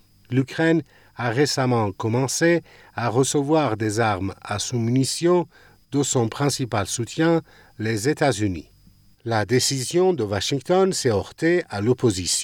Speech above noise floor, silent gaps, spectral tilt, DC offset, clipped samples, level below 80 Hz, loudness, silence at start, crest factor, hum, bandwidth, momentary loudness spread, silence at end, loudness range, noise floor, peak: 32 dB; none; -4.5 dB/octave; under 0.1%; under 0.1%; -58 dBFS; -22 LUFS; 0.3 s; 16 dB; none; 17.5 kHz; 7 LU; 0 s; 2 LU; -54 dBFS; -6 dBFS